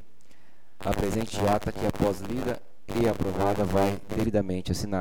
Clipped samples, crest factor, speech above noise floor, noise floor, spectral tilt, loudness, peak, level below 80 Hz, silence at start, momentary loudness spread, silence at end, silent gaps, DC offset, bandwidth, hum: under 0.1%; 18 dB; 35 dB; -61 dBFS; -6 dB/octave; -28 LUFS; -8 dBFS; -44 dBFS; 0.8 s; 6 LU; 0 s; none; 2%; 19 kHz; none